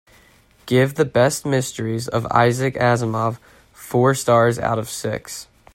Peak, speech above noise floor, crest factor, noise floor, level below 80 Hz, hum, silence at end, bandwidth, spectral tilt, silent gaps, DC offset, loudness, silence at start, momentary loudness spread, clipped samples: 0 dBFS; 34 dB; 18 dB; -53 dBFS; -52 dBFS; none; 0.35 s; 16.5 kHz; -5.5 dB/octave; none; under 0.1%; -19 LUFS; 0.65 s; 10 LU; under 0.1%